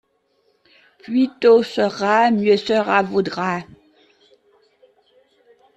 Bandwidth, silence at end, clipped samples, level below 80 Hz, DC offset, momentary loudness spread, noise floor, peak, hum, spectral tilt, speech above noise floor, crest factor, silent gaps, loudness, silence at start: 8.4 kHz; 2.15 s; under 0.1%; -64 dBFS; under 0.1%; 9 LU; -64 dBFS; -2 dBFS; none; -6 dB/octave; 47 dB; 20 dB; none; -18 LUFS; 1.1 s